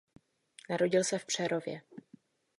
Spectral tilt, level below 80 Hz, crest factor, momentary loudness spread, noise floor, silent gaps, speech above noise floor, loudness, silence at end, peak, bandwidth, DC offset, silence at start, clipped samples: -3.5 dB/octave; -80 dBFS; 20 dB; 21 LU; -62 dBFS; none; 30 dB; -32 LUFS; 0.6 s; -14 dBFS; 11.5 kHz; under 0.1%; 0.7 s; under 0.1%